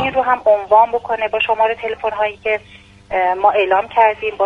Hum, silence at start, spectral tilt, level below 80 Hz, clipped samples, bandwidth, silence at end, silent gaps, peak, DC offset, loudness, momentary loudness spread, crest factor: none; 0 s; -5 dB/octave; -50 dBFS; under 0.1%; 6.8 kHz; 0 s; none; 0 dBFS; under 0.1%; -16 LUFS; 8 LU; 16 dB